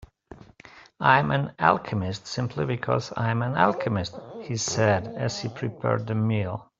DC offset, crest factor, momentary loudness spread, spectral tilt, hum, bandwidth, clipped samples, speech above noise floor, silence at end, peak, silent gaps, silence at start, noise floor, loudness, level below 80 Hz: under 0.1%; 22 dB; 10 LU; -5.5 dB/octave; none; 7.8 kHz; under 0.1%; 25 dB; 0.15 s; -2 dBFS; none; 0 s; -50 dBFS; -25 LUFS; -58 dBFS